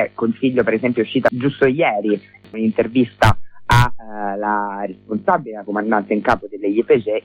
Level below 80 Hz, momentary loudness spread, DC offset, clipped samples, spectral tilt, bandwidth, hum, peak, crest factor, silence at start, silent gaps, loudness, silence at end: -36 dBFS; 9 LU; under 0.1%; under 0.1%; -7 dB/octave; 16.5 kHz; none; -2 dBFS; 16 dB; 0 s; none; -18 LUFS; 0.05 s